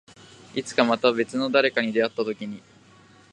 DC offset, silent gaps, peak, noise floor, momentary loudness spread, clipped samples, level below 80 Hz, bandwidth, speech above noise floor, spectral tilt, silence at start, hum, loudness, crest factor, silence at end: under 0.1%; none; -2 dBFS; -53 dBFS; 13 LU; under 0.1%; -72 dBFS; 10.5 kHz; 30 dB; -4.5 dB/octave; 0.55 s; none; -23 LUFS; 22 dB; 0.75 s